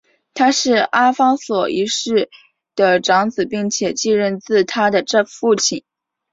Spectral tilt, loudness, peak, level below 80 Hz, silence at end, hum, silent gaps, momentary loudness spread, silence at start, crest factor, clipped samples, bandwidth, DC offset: -3 dB/octave; -16 LUFS; -2 dBFS; -62 dBFS; 0.55 s; none; none; 6 LU; 0.35 s; 16 dB; under 0.1%; 7.8 kHz; under 0.1%